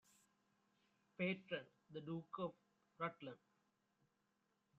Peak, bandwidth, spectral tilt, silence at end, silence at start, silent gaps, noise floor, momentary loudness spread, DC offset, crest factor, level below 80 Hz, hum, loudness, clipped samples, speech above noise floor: -30 dBFS; 7.4 kHz; -4.5 dB/octave; 1.45 s; 1.2 s; none; -85 dBFS; 13 LU; under 0.1%; 22 dB; -88 dBFS; none; -49 LUFS; under 0.1%; 37 dB